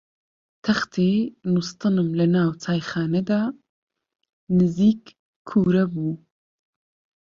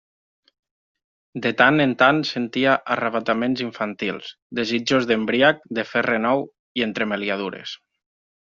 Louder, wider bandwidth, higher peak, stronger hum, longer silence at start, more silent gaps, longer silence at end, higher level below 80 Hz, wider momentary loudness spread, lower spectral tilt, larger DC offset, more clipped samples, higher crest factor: about the same, -22 LUFS vs -21 LUFS; about the same, 7.4 kHz vs 7.6 kHz; second, -8 dBFS vs -2 dBFS; neither; second, 0.65 s vs 1.35 s; first, 3.69-3.87 s, 4.33-4.47 s, 5.19-5.45 s vs 4.42-4.50 s, 6.59-6.75 s; first, 1.05 s vs 0.65 s; first, -58 dBFS vs -64 dBFS; second, 9 LU vs 13 LU; first, -7.5 dB/octave vs -2.5 dB/octave; neither; neither; about the same, 16 dB vs 20 dB